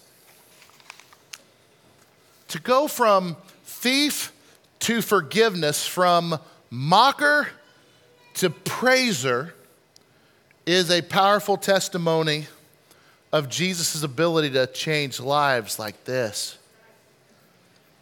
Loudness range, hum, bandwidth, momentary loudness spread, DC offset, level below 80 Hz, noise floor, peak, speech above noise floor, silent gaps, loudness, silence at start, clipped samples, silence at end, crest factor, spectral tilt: 4 LU; none; 18 kHz; 15 LU; under 0.1%; -72 dBFS; -58 dBFS; -2 dBFS; 37 dB; none; -22 LUFS; 2.5 s; under 0.1%; 1.5 s; 22 dB; -3.5 dB/octave